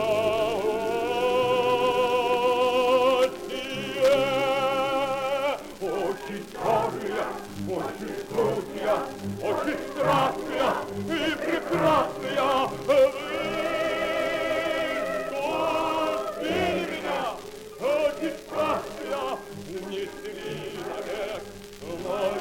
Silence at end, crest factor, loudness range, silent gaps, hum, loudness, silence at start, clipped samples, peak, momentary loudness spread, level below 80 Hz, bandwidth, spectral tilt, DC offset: 0 s; 14 dB; 7 LU; none; none; -26 LUFS; 0 s; under 0.1%; -12 dBFS; 11 LU; -54 dBFS; 17 kHz; -4.5 dB/octave; under 0.1%